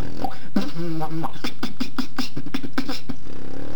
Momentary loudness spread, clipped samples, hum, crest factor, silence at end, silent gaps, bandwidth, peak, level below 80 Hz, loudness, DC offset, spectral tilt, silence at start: 8 LU; under 0.1%; none; 20 dB; 0 s; none; 19 kHz; -6 dBFS; -50 dBFS; -30 LUFS; 20%; -5.5 dB/octave; 0 s